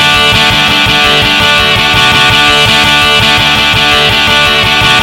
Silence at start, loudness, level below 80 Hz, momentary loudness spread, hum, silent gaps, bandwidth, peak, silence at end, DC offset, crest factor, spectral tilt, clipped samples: 0 s; -5 LUFS; -26 dBFS; 1 LU; none; none; over 20 kHz; 0 dBFS; 0 s; 0.1%; 6 dB; -2.5 dB/octave; 1%